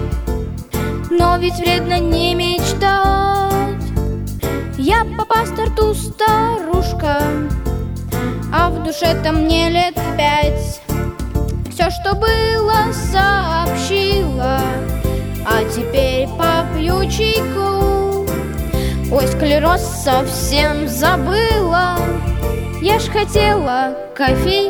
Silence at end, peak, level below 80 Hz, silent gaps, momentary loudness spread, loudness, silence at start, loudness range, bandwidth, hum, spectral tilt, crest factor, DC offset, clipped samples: 0 s; 0 dBFS; -24 dBFS; none; 7 LU; -16 LUFS; 0 s; 2 LU; over 20 kHz; none; -5 dB/octave; 16 dB; under 0.1%; under 0.1%